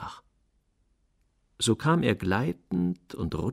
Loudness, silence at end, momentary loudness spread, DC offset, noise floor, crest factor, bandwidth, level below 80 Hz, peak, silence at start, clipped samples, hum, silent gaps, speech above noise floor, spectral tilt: -28 LUFS; 0 s; 10 LU; under 0.1%; -70 dBFS; 18 dB; 14.5 kHz; -52 dBFS; -10 dBFS; 0 s; under 0.1%; none; none; 43 dB; -5.5 dB/octave